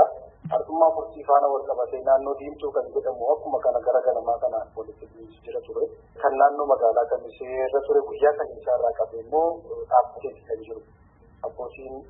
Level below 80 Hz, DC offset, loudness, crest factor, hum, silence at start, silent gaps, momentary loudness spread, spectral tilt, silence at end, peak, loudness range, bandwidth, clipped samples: -58 dBFS; under 0.1%; -24 LUFS; 20 dB; none; 0 s; none; 16 LU; -10 dB/octave; 0.05 s; -4 dBFS; 3 LU; 3.9 kHz; under 0.1%